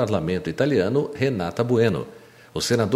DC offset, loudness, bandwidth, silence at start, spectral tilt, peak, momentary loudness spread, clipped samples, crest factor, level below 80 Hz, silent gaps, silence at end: under 0.1%; -23 LUFS; 15.5 kHz; 0 s; -6 dB/octave; -6 dBFS; 9 LU; under 0.1%; 16 dB; -52 dBFS; none; 0 s